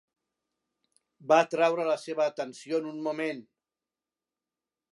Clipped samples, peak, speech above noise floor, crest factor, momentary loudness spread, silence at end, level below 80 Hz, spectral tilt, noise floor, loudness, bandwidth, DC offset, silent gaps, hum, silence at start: under 0.1%; -8 dBFS; over 62 dB; 22 dB; 13 LU; 1.5 s; -88 dBFS; -4.5 dB/octave; under -90 dBFS; -28 LUFS; 11.5 kHz; under 0.1%; none; none; 1.25 s